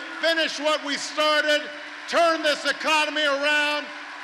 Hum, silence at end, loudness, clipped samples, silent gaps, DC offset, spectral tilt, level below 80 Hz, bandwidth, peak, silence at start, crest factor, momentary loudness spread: none; 0 s; -22 LUFS; under 0.1%; none; under 0.1%; -0.5 dB/octave; -74 dBFS; 14 kHz; -12 dBFS; 0 s; 12 dB; 7 LU